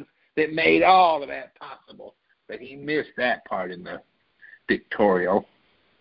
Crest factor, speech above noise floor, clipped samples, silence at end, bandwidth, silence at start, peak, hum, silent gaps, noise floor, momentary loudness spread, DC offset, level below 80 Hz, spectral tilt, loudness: 20 dB; 30 dB; under 0.1%; 0.55 s; 5.6 kHz; 0 s; -4 dBFS; none; none; -53 dBFS; 24 LU; under 0.1%; -60 dBFS; -9.5 dB/octave; -22 LUFS